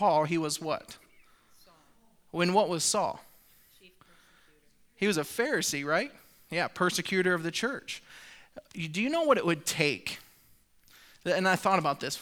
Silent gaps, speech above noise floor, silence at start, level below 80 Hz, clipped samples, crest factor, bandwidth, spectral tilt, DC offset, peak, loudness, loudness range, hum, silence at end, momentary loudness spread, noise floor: none; 34 dB; 0 s; -68 dBFS; under 0.1%; 22 dB; over 20 kHz; -3.5 dB/octave; under 0.1%; -8 dBFS; -29 LUFS; 3 LU; none; 0 s; 17 LU; -63 dBFS